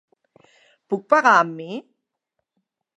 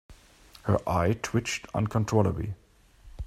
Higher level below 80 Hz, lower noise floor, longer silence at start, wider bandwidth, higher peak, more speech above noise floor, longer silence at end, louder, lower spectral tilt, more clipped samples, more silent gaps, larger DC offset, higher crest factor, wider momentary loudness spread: second, -82 dBFS vs -48 dBFS; first, -79 dBFS vs -54 dBFS; first, 0.9 s vs 0.1 s; second, 10.5 kHz vs 14.5 kHz; first, -2 dBFS vs -8 dBFS; first, 60 dB vs 28 dB; first, 1.15 s vs 0 s; first, -18 LUFS vs -28 LUFS; second, -4.5 dB/octave vs -6 dB/octave; neither; neither; neither; about the same, 22 dB vs 20 dB; first, 19 LU vs 11 LU